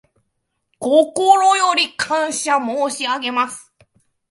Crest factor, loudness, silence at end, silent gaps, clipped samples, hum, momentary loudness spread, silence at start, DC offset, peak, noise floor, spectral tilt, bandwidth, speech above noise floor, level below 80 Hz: 18 dB; -17 LUFS; 0.7 s; none; under 0.1%; none; 9 LU; 0.8 s; under 0.1%; 0 dBFS; -72 dBFS; -1 dB/octave; 11.5 kHz; 56 dB; -66 dBFS